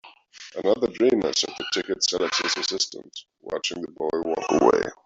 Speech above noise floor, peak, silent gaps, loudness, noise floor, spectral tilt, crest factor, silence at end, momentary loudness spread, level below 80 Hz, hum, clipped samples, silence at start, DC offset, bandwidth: 22 dB; -4 dBFS; none; -24 LUFS; -46 dBFS; -2.5 dB/octave; 20 dB; 0.15 s; 15 LU; -60 dBFS; none; under 0.1%; 0.05 s; under 0.1%; 8.2 kHz